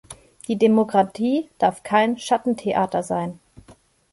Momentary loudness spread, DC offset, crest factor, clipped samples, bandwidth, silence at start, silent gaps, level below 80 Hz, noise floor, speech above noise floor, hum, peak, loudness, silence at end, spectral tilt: 9 LU; under 0.1%; 16 dB; under 0.1%; 11.5 kHz; 0.1 s; none; -60 dBFS; -52 dBFS; 32 dB; none; -6 dBFS; -21 LUFS; 0.4 s; -5.5 dB/octave